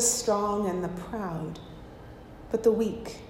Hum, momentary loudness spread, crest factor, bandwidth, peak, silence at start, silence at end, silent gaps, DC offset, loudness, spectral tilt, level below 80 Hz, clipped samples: none; 22 LU; 18 dB; 16 kHz; -12 dBFS; 0 s; 0 s; none; under 0.1%; -29 LUFS; -4 dB/octave; -52 dBFS; under 0.1%